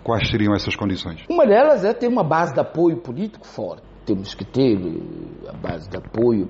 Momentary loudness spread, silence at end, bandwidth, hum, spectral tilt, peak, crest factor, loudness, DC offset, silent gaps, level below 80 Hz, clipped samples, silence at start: 16 LU; 0 s; 7.6 kHz; none; -5.5 dB/octave; -6 dBFS; 14 dB; -20 LUFS; under 0.1%; none; -44 dBFS; under 0.1%; 0 s